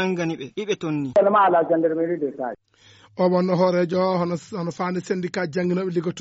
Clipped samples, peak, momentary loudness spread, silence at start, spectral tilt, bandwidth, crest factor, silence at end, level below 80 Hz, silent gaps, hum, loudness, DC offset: under 0.1%; -8 dBFS; 11 LU; 0 s; -6 dB/octave; 8 kHz; 14 dB; 0 s; -66 dBFS; none; none; -22 LUFS; under 0.1%